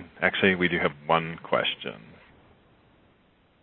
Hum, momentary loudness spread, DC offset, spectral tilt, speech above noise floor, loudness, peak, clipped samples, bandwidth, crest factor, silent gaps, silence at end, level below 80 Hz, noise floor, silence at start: none; 14 LU; under 0.1%; -9.5 dB/octave; 37 dB; -25 LUFS; -6 dBFS; under 0.1%; 4.4 kHz; 22 dB; none; 1.5 s; -58 dBFS; -62 dBFS; 0 s